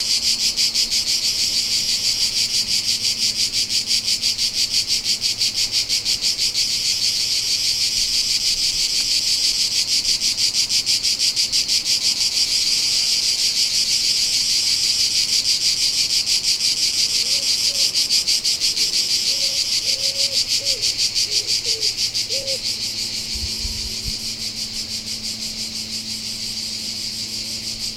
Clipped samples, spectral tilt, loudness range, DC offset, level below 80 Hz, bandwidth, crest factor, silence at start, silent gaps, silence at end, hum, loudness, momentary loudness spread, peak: under 0.1%; 1 dB/octave; 7 LU; under 0.1%; -46 dBFS; 16 kHz; 16 dB; 0 s; none; 0 s; none; -17 LUFS; 8 LU; -4 dBFS